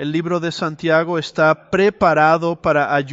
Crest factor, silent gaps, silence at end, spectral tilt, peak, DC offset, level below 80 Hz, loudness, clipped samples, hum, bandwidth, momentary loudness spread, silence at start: 16 dB; none; 0 s; -6 dB/octave; -2 dBFS; under 0.1%; -52 dBFS; -17 LUFS; under 0.1%; none; 8 kHz; 7 LU; 0 s